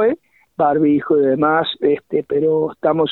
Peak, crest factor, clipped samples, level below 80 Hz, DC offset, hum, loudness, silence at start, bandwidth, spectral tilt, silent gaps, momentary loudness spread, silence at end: -2 dBFS; 14 dB; under 0.1%; -58 dBFS; under 0.1%; none; -17 LUFS; 0 s; 4.2 kHz; -9 dB/octave; none; 6 LU; 0 s